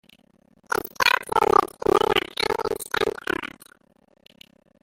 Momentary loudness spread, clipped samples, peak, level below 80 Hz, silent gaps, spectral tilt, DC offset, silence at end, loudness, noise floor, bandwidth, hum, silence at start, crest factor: 10 LU; under 0.1%; -2 dBFS; -52 dBFS; none; -3 dB/octave; under 0.1%; 1.35 s; -23 LUFS; -59 dBFS; 16.5 kHz; none; 0.7 s; 22 dB